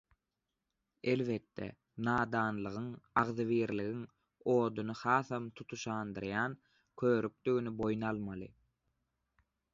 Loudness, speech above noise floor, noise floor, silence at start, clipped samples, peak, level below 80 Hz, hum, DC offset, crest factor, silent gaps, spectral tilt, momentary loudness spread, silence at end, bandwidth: -36 LUFS; 53 dB; -88 dBFS; 1.05 s; under 0.1%; -14 dBFS; -68 dBFS; none; under 0.1%; 22 dB; none; -5.5 dB/octave; 13 LU; 1.25 s; 7.6 kHz